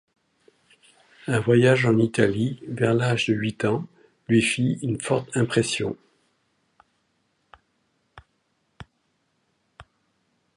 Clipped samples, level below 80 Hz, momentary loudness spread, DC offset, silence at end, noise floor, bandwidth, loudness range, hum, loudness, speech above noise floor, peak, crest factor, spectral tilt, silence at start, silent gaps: under 0.1%; -58 dBFS; 10 LU; under 0.1%; 0.75 s; -71 dBFS; 11.5 kHz; 8 LU; none; -23 LUFS; 50 dB; -4 dBFS; 22 dB; -5.5 dB/octave; 1.25 s; none